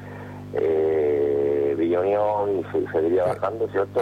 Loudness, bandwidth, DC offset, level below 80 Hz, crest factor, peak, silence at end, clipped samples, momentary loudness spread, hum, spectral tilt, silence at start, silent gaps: -23 LUFS; 9.4 kHz; under 0.1%; -58 dBFS; 10 dB; -12 dBFS; 0 s; under 0.1%; 5 LU; 50 Hz at -40 dBFS; -8.5 dB/octave; 0 s; none